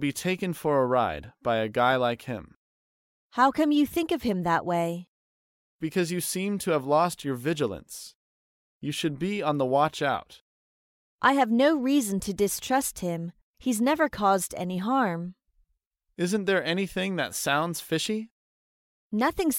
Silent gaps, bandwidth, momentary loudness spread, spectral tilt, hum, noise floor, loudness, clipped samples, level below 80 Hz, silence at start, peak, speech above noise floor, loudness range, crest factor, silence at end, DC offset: 2.56-3.30 s, 5.08-5.79 s, 8.15-8.81 s, 10.41-11.18 s, 13.43-13.54 s, 15.87-15.91 s, 18.31-19.10 s; 17 kHz; 11 LU; -4.5 dB/octave; none; -76 dBFS; -26 LUFS; under 0.1%; -58 dBFS; 0 s; -8 dBFS; 50 dB; 3 LU; 20 dB; 0 s; under 0.1%